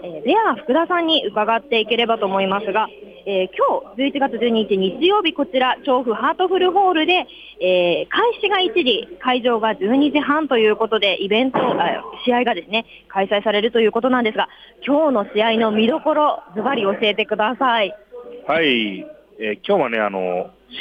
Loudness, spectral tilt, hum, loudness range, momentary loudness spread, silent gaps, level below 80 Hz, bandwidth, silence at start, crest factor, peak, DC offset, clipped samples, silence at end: -18 LUFS; -6.5 dB/octave; none; 2 LU; 7 LU; none; -60 dBFS; 6 kHz; 0 s; 14 dB; -6 dBFS; under 0.1%; under 0.1%; 0 s